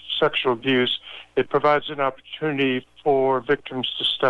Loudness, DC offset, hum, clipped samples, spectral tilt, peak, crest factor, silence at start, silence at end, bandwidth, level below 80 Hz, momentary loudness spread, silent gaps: -22 LUFS; under 0.1%; none; under 0.1%; -6 dB/octave; -6 dBFS; 16 dB; 0.05 s; 0 s; 10.5 kHz; -60 dBFS; 7 LU; none